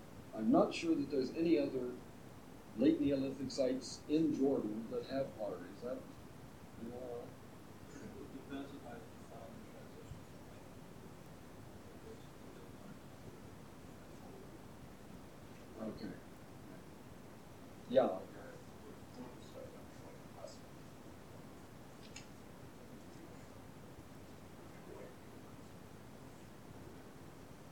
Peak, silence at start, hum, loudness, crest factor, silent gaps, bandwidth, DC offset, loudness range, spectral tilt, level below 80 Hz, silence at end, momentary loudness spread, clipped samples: -18 dBFS; 0 s; none; -39 LUFS; 24 dB; none; 19 kHz; under 0.1%; 18 LU; -6 dB/octave; -68 dBFS; 0 s; 21 LU; under 0.1%